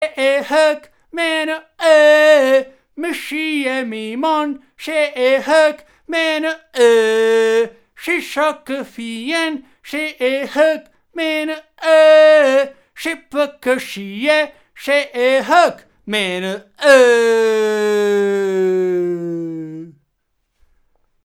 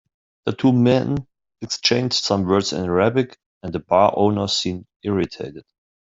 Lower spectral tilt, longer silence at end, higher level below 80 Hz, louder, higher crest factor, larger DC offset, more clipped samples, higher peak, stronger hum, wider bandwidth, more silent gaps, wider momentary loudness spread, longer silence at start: second, -3.5 dB/octave vs -5 dB/octave; first, 1.35 s vs 0.45 s; second, -64 dBFS vs -54 dBFS; first, -15 LUFS vs -20 LUFS; about the same, 16 dB vs 18 dB; neither; neither; about the same, 0 dBFS vs -2 dBFS; neither; first, 16 kHz vs 8 kHz; second, none vs 3.46-3.61 s, 4.96-5.00 s; first, 16 LU vs 13 LU; second, 0 s vs 0.45 s